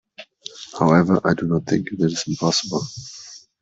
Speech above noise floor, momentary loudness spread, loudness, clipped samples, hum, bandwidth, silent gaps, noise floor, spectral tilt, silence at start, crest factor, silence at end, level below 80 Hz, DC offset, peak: 21 dB; 20 LU; -20 LUFS; under 0.1%; none; 8 kHz; none; -41 dBFS; -5.5 dB/octave; 0.2 s; 18 dB; 0.25 s; -54 dBFS; under 0.1%; -2 dBFS